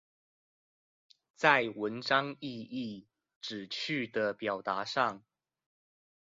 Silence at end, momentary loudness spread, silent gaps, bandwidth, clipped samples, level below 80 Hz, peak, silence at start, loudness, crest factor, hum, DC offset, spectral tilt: 1.1 s; 16 LU; 3.36-3.41 s; 7.4 kHz; under 0.1%; -78 dBFS; -10 dBFS; 1.4 s; -32 LUFS; 26 dB; none; under 0.1%; -2 dB/octave